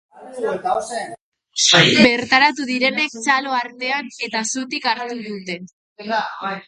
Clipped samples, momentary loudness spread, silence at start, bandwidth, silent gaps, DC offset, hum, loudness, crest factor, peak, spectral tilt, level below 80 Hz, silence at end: under 0.1%; 17 LU; 0.15 s; 11.5 kHz; 1.21-1.32 s, 5.73-5.96 s; under 0.1%; none; -17 LUFS; 20 dB; 0 dBFS; -2.5 dB/octave; -60 dBFS; 0.05 s